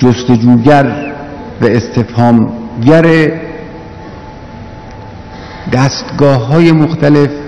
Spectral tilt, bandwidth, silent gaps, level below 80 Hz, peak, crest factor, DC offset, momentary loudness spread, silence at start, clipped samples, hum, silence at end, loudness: -7.5 dB/octave; 9.4 kHz; none; -36 dBFS; 0 dBFS; 10 dB; under 0.1%; 22 LU; 0 s; 4%; none; 0 s; -9 LUFS